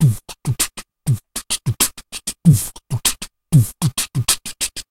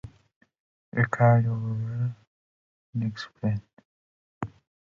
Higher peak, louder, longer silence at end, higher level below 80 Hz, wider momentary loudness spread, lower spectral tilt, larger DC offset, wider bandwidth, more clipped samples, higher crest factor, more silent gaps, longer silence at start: first, 0 dBFS vs -10 dBFS; first, -19 LUFS vs -27 LUFS; second, 0.1 s vs 0.4 s; first, -42 dBFS vs -58 dBFS; second, 11 LU vs 19 LU; second, -4 dB/octave vs -8.5 dB/octave; neither; first, 16.5 kHz vs 7.2 kHz; neither; about the same, 18 dB vs 20 dB; second, none vs 0.36-0.41 s, 0.60-0.92 s, 2.27-2.93 s, 3.73-3.77 s, 3.85-4.41 s; about the same, 0 s vs 0.05 s